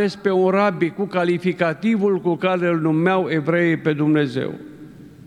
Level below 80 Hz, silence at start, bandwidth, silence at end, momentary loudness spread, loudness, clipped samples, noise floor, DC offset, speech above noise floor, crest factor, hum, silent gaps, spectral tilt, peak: -62 dBFS; 0 s; 11 kHz; 0.15 s; 5 LU; -19 LUFS; under 0.1%; -41 dBFS; under 0.1%; 22 dB; 14 dB; none; none; -8 dB/octave; -4 dBFS